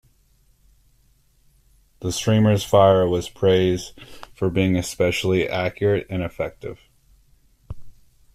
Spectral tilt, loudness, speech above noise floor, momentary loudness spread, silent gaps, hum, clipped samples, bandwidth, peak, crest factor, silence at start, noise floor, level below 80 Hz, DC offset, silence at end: -6 dB/octave; -20 LUFS; 39 dB; 24 LU; none; none; under 0.1%; 14.5 kHz; -4 dBFS; 18 dB; 2 s; -59 dBFS; -48 dBFS; under 0.1%; 0.45 s